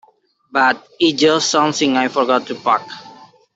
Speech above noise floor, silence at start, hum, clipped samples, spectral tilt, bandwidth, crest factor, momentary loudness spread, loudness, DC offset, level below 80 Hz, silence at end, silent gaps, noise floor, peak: 38 dB; 0.55 s; none; under 0.1%; -3 dB/octave; 8 kHz; 16 dB; 7 LU; -16 LUFS; under 0.1%; -64 dBFS; 0.45 s; none; -54 dBFS; -2 dBFS